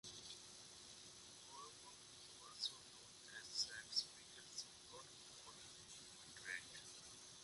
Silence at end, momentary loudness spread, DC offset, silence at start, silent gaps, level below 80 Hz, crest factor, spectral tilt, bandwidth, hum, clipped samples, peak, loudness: 0 s; 14 LU; under 0.1%; 0.05 s; none; -82 dBFS; 28 dB; 0 dB/octave; 11.5 kHz; none; under 0.1%; -28 dBFS; -51 LUFS